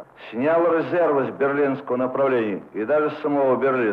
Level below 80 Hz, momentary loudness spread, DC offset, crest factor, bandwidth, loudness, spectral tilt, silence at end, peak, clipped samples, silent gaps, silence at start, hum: -70 dBFS; 5 LU; under 0.1%; 12 dB; 5.4 kHz; -21 LUFS; -9 dB/octave; 0 s; -10 dBFS; under 0.1%; none; 0 s; none